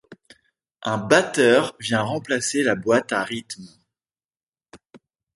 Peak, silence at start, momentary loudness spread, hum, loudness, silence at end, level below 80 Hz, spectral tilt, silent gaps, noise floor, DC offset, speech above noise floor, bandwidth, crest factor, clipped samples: 0 dBFS; 0.1 s; 14 LU; none; -21 LUFS; 0.4 s; -64 dBFS; -4 dB/octave; 4.25-4.29 s, 4.49-4.53 s; under -90 dBFS; under 0.1%; over 69 dB; 11.5 kHz; 24 dB; under 0.1%